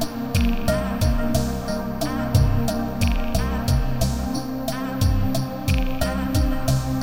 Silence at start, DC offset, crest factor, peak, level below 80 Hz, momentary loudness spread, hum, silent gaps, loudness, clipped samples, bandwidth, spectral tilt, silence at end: 0 s; 1%; 16 dB; -6 dBFS; -26 dBFS; 5 LU; none; none; -23 LUFS; under 0.1%; 17 kHz; -6 dB/octave; 0 s